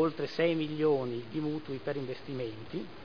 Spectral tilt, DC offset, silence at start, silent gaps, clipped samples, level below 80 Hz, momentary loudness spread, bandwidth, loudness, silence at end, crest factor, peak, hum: -8 dB/octave; 0.4%; 0 s; none; under 0.1%; -66 dBFS; 9 LU; 5.4 kHz; -33 LUFS; 0 s; 18 dB; -16 dBFS; none